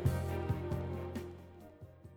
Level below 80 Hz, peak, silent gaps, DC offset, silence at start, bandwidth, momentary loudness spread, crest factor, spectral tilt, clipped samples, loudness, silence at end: -50 dBFS; -20 dBFS; none; under 0.1%; 0 s; 17.5 kHz; 18 LU; 20 dB; -7.5 dB/octave; under 0.1%; -39 LUFS; 0 s